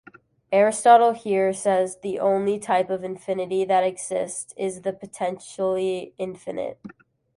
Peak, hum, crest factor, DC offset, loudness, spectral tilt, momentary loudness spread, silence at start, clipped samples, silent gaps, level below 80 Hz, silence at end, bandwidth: -2 dBFS; none; 20 dB; under 0.1%; -23 LUFS; -4.5 dB/octave; 14 LU; 0.5 s; under 0.1%; none; -68 dBFS; 0.5 s; 11.5 kHz